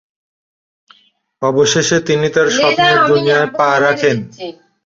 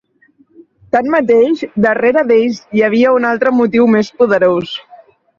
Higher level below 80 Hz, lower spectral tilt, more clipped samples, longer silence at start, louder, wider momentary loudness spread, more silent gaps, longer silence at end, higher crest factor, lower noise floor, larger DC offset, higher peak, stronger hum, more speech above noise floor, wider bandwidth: about the same, -56 dBFS vs -54 dBFS; second, -3.5 dB/octave vs -6.5 dB/octave; neither; first, 1.4 s vs 0.95 s; about the same, -13 LUFS vs -12 LUFS; first, 10 LU vs 6 LU; neither; second, 0.35 s vs 0.6 s; about the same, 14 dB vs 12 dB; about the same, -50 dBFS vs -52 dBFS; neither; about the same, 0 dBFS vs -2 dBFS; neither; second, 37 dB vs 41 dB; about the same, 7.8 kHz vs 7.2 kHz